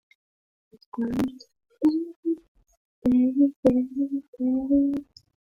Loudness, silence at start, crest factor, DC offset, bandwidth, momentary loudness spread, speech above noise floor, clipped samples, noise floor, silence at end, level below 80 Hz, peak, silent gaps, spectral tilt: -25 LUFS; 0.95 s; 20 dB; under 0.1%; 7 kHz; 10 LU; over 67 dB; under 0.1%; under -90 dBFS; 0.55 s; -56 dBFS; -6 dBFS; 2.16-2.23 s, 2.48-2.55 s, 2.77-3.02 s, 3.56-3.63 s, 4.28-4.33 s; -8 dB/octave